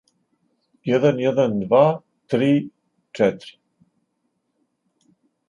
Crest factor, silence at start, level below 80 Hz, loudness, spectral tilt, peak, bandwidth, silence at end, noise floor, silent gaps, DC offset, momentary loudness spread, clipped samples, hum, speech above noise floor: 20 dB; 0.85 s; -64 dBFS; -20 LUFS; -7.5 dB/octave; -2 dBFS; 10 kHz; 2 s; -73 dBFS; none; under 0.1%; 17 LU; under 0.1%; none; 54 dB